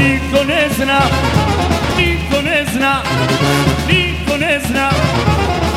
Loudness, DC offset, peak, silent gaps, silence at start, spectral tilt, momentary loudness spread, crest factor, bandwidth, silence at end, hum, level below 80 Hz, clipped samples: -14 LUFS; under 0.1%; 0 dBFS; none; 0 s; -5 dB/octave; 2 LU; 14 dB; 16.5 kHz; 0 s; none; -26 dBFS; under 0.1%